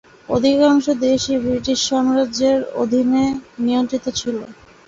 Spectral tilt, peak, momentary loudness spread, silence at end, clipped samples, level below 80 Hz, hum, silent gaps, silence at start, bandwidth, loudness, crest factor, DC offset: -4 dB/octave; -4 dBFS; 8 LU; 0.35 s; under 0.1%; -48 dBFS; none; none; 0.3 s; 7.8 kHz; -18 LUFS; 14 dB; under 0.1%